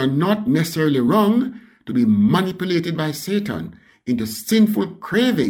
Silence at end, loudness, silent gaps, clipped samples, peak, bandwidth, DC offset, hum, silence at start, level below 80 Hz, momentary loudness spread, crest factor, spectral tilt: 0 s; -19 LUFS; none; under 0.1%; -6 dBFS; 18.5 kHz; under 0.1%; none; 0 s; -56 dBFS; 11 LU; 12 dB; -6 dB/octave